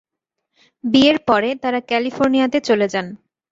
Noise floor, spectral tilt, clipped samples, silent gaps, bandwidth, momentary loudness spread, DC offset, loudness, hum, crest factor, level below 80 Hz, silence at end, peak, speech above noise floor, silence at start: -78 dBFS; -5 dB/octave; under 0.1%; none; 7.8 kHz; 10 LU; under 0.1%; -17 LUFS; none; 16 dB; -56 dBFS; 0.35 s; -2 dBFS; 61 dB; 0.85 s